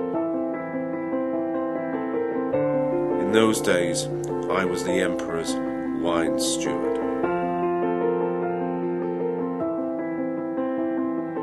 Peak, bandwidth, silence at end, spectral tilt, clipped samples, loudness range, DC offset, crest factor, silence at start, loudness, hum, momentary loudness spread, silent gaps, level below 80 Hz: -4 dBFS; 12.5 kHz; 0 s; -5 dB/octave; under 0.1%; 3 LU; under 0.1%; 20 dB; 0 s; -25 LUFS; none; 6 LU; none; -56 dBFS